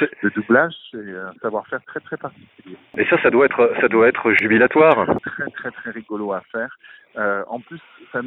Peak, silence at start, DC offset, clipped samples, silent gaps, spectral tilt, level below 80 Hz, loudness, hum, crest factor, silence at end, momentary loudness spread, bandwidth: -2 dBFS; 0 s; under 0.1%; under 0.1%; none; -8 dB/octave; -60 dBFS; -18 LUFS; none; 18 dB; 0 s; 18 LU; 4.1 kHz